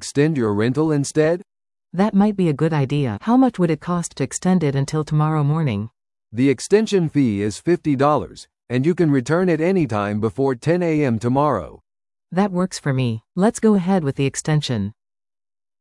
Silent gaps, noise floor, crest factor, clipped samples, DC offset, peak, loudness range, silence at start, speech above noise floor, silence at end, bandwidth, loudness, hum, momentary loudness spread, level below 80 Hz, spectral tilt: none; under -90 dBFS; 16 dB; under 0.1%; under 0.1%; -4 dBFS; 2 LU; 0 s; over 71 dB; 0.9 s; 12 kHz; -19 LUFS; none; 7 LU; -54 dBFS; -6.5 dB/octave